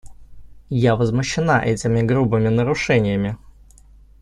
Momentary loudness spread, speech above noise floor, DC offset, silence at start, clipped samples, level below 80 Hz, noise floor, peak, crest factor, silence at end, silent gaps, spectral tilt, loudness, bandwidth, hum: 6 LU; 29 dB; under 0.1%; 0.05 s; under 0.1%; -42 dBFS; -47 dBFS; -4 dBFS; 16 dB; 0.85 s; none; -6.5 dB/octave; -19 LUFS; 10.5 kHz; none